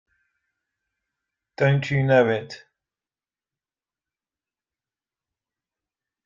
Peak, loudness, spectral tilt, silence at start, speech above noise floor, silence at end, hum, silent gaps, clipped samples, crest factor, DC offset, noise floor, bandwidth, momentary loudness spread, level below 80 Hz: -6 dBFS; -21 LUFS; -7.5 dB/octave; 1.6 s; over 70 dB; 3.7 s; none; none; under 0.1%; 22 dB; under 0.1%; under -90 dBFS; 7.4 kHz; 19 LU; -62 dBFS